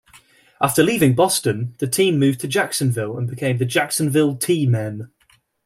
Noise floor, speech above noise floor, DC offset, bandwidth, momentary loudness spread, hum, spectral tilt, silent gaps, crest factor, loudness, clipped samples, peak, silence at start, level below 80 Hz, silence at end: -51 dBFS; 33 dB; under 0.1%; 16 kHz; 8 LU; none; -5 dB/octave; none; 18 dB; -19 LUFS; under 0.1%; -2 dBFS; 0.6 s; -58 dBFS; 0.6 s